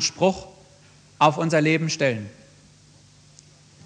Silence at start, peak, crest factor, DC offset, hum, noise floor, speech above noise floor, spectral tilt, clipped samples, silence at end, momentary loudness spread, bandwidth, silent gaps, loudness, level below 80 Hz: 0 s; -4 dBFS; 22 dB; under 0.1%; none; -53 dBFS; 31 dB; -4.5 dB/octave; under 0.1%; 1.55 s; 14 LU; 9.8 kHz; none; -22 LUFS; -60 dBFS